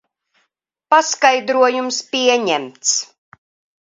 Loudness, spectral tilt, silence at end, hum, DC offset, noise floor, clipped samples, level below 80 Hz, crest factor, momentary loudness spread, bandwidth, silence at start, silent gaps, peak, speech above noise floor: -16 LUFS; -0.5 dB/octave; 0.75 s; none; under 0.1%; -71 dBFS; under 0.1%; -72 dBFS; 18 dB; 6 LU; 7.8 kHz; 0.9 s; none; 0 dBFS; 55 dB